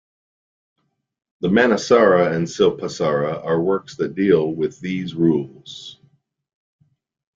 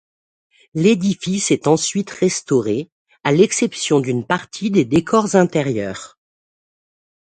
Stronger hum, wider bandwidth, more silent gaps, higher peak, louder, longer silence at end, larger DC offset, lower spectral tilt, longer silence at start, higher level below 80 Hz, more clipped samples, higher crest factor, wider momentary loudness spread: neither; second, 7.6 kHz vs 9.4 kHz; second, none vs 2.92-3.05 s; about the same, -2 dBFS vs 0 dBFS; about the same, -19 LUFS vs -18 LUFS; first, 1.45 s vs 1.15 s; neither; about the same, -6 dB/octave vs -5 dB/octave; first, 1.4 s vs 0.75 s; about the same, -60 dBFS vs -56 dBFS; neither; about the same, 18 dB vs 18 dB; first, 14 LU vs 9 LU